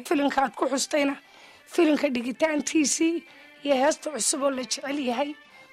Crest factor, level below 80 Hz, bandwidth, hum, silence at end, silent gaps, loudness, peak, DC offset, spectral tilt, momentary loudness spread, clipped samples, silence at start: 16 dB; -68 dBFS; 15.5 kHz; none; 0.1 s; none; -25 LUFS; -10 dBFS; under 0.1%; -2 dB/octave; 8 LU; under 0.1%; 0 s